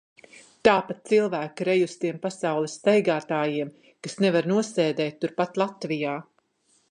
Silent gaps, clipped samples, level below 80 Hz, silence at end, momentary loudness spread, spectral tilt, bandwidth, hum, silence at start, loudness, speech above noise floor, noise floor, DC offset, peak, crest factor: none; under 0.1%; -70 dBFS; 0.7 s; 8 LU; -5.5 dB/octave; 10.5 kHz; none; 0.65 s; -25 LUFS; 43 dB; -67 dBFS; under 0.1%; -2 dBFS; 22 dB